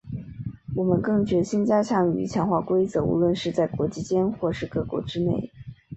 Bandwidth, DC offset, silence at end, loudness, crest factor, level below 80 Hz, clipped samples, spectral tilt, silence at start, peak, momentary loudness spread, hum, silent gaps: 8.2 kHz; under 0.1%; 0 s; -24 LUFS; 18 dB; -50 dBFS; under 0.1%; -7.5 dB/octave; 0.05 s; -6 dBFS; 11 LU; none; none